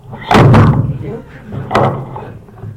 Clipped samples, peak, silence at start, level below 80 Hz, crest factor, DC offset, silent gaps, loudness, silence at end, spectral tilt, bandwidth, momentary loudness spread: under 0.1%; -2 dBFS; 0.1 s; -30 dBFS; 12 dB; under 0.1%; none; -10 LUFS; 0 s; -7.5 dB/octave; 11.5 kHz; 22 LU